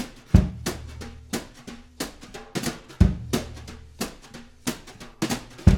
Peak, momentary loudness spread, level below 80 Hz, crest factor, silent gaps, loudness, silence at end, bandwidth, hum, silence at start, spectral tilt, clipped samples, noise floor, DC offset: 0 dBFS; 21 LU; -32 dBFS; 26 dB; none; -27 LUFS; 0 s; 17.5 kHz; none; 0 s; -5.5 dB/octave; under 0.1%; -45 dBFS; under 0.1%